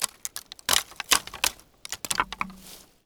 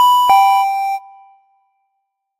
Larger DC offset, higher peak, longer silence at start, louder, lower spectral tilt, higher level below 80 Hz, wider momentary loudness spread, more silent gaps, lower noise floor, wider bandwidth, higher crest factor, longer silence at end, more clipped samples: neither; about the same, -2 dBFS vs 0 dBFS; about the same, 0 s vs 0 s; second, -27 LUFS vs -13 LUFS; about the same, 0.5 dB/octave vs 1 dB/octave; first, -56 dBFS vs -62 dBFS; first, 17 LU vs 13 LU; neither; second, -49 dBFS vs -73 dBFS; first, over 20 kHz vs 16 kHz; first, 28 dB vs 16 dB; second, 0.25 s vs 1.4 s; neither